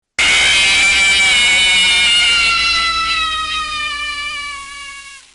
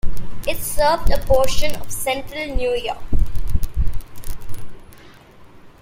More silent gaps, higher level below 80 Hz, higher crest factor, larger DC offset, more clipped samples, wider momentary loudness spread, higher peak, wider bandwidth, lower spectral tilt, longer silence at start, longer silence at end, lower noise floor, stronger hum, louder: neither; second, -38 dBFS vs -24 dBFS; about the same, 10 dB vs 14 dB; neither; neither; second, 15 LU vs 19 LU; second, -6 dBFS vs -2 dBFS; second, 11.5 kHz vs 16 kHz; second, 1 dB/octave vs -4 dB/octave; first, 0.2 s vs 0.05 s; about the same, 0.15 s vs 0.15 s; second, -34 dBFS vs -43 dBFS; neither; first, -11 LUFS vs -22 LUFS